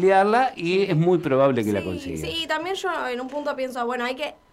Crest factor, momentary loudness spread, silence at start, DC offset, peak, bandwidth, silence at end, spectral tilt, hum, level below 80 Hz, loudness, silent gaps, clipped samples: 16 dB; 9 LU; 0 s; under 0.1%; -6 dBFS; 15 kHz; 0.2 s; -6 dB/octave; none; -56 dBFS; -23 LUFS; none; under 0.1%